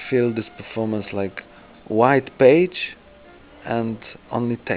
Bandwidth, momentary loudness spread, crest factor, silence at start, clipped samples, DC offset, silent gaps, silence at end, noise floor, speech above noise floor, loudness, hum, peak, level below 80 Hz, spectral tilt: 4 kHz; 16 LU; 20 dB; 0 s; under 0.1%; under 0.1%; none; 0 s; -47 dBFS; 26 dB; -21 LUFS; none; -2 dBFS; -56 dBFS; -10.5 dB/octave